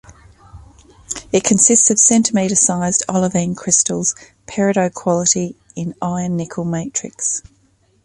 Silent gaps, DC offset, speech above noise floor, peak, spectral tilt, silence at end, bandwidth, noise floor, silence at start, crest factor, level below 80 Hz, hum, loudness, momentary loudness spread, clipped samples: none; under 0.1%; 41 dB; 0 dBFS; -4 dB/octave; 0.65 s; 11.5 kHz; -57 dBFS; 0.1 s; 18 dB; -50 dBFS; none; -15 LUFS; 16 LU; under 0.1%